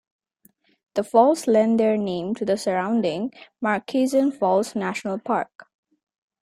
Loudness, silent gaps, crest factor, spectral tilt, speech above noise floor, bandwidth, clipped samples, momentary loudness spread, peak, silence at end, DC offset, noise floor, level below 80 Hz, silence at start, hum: -22 LUFS; 5.55-5.59 s; 20 dB; -5.5 dB/octave; 40 dB; 15 kHz; under 0.1%; 11 LU; -4 dBFS; 0.8 s; under 0.1%; -61 dBFS; -68 dBFS; 0.95 s; none